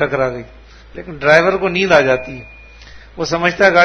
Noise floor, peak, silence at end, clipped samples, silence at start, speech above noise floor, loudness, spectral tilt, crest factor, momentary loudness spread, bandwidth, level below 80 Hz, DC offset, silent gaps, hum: -38 dBFS; 0 dBFS; 0 s; 0.1%; 0 s; 24 dB; -14 LUFS; -5 dB/octave; 16 dB; 20 LU; 11 kHz; -42 dBFS; under 0.1%; none; none